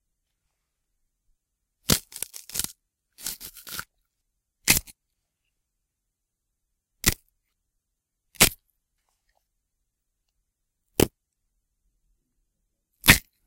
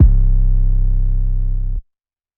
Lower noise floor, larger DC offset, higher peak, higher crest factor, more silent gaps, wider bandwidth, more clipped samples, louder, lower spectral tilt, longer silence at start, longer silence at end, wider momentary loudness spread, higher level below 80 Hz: first, -82 dBFS vs -75 dBFS; neither; about the same, 0 dBFS vs 0 dBFS; first, 30 dB vs 14 dB; neither; first, 17 kHz vs 0.9 kHz; neither; second, -23 LUFS vs -20 LUFS; second, -2 dB/octave vs -13.5 dB/octave; first, 1.9 s vs 0 s; second, 0.25 s vs 0.55 s; first, 18 LU vs 9 LU; second, -44 dBFS vs -14 dBFS